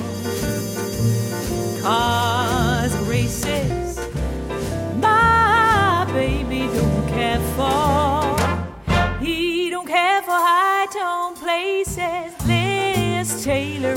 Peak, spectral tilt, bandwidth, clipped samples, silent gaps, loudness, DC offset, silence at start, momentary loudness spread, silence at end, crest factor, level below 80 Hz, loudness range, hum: -4 dBFS; -5 dB/octave; 17 kHz; under 0.1%; none; -20 LUFS; under 0.1%; 0 s; 9 LU; 0 s; 14 dB; -34 dBFS; 3 LU; none